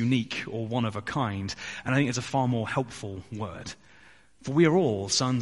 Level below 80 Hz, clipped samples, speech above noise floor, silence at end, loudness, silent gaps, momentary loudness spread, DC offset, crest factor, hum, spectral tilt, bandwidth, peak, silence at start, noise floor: -60 dBFS; under 0.1%; 29 dB; 0 s; -28 LUFS; none; 15 LU; 0.1%; 18 dB; none; -5 dB/octave; 11.5 kHz; -8 dBFS; 0 s; -56 dBFS